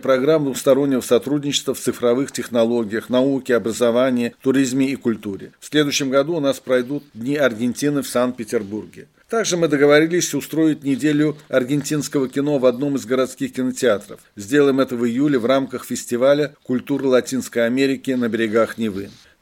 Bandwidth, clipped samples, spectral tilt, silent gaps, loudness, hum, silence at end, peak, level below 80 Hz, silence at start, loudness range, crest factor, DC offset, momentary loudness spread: 17 kHz; under 0.1%; -4.5 dB/octave; none; -19 LUFS; none; 0.3 s; -2 dBFS; -64 dBFS; 0 s; 2 LU; 18 dB; under 0.1%; 8 LU